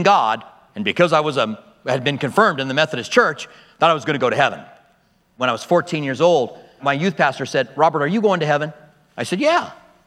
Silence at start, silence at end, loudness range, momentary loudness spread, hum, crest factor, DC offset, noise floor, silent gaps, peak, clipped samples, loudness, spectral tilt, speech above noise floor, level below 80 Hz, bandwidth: 0 s; 0.35 s; 2 LU; 12 LU; none; 18 dB; under 0.1%; -59 dBFS; none; 0 dBFS; under 0.1%; -19 LUFS; -5 dB/octave; 41 dB; -66 dBFS; 13 kHz